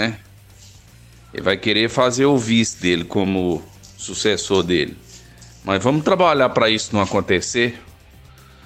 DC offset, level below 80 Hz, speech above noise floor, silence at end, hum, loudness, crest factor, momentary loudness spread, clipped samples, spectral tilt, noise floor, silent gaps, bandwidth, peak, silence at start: under 0.1%; -48 dBFS; 27 dB; 0.85 s; none; -18 LUFS; 18 dB; 12 LU; under 0.1%; -4 dB/octave; -46 dBFS; none; 15.5 kHz; -2 dBFS; 0 s